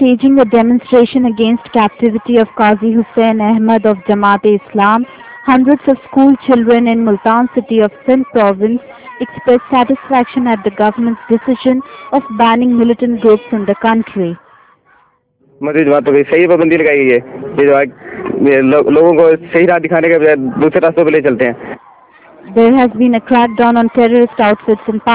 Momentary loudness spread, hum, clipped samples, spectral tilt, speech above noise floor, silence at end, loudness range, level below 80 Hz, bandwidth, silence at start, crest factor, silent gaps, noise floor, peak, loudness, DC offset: 7 LU; none; 1%; -10.5 dB/octave; 43 dB; 0 s; 3 LU; -48 dBFS; 4 kHz; 0 s; 10 dB; none; -53 dBFS; 0 dBFS; -11 LUFS; under 0.1%